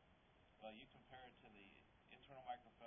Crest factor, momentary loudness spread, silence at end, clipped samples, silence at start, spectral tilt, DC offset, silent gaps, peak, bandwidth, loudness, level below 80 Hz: 22 dB; 11 LU; 0 s; under 0.1%; 0 s; -1 dB/octave; under 0.1%; none; -40 dBFS; 3.6 kHz; -61 LUFS; -80 dBFS